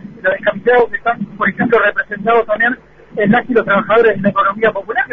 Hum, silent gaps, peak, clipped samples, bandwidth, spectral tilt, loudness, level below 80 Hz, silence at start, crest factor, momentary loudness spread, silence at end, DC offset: none; none; -2 dBFS; under 0.1%; 4.3 kHz; -8.5 dB/octave; -14 LUFS; -50 dBFS; 0 s; 12 dB; 6 LU; 0 s; under 0.1%